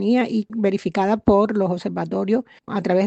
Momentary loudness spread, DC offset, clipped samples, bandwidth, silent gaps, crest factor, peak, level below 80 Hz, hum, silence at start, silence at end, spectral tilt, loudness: 8 LU; under 0.1%; under 0.1%; 8.2 kHz; none; 16 dB; -4 dBFS; -46 dBFS; none; 0 s; 0 s; -8 dB/octave; -21 LUFS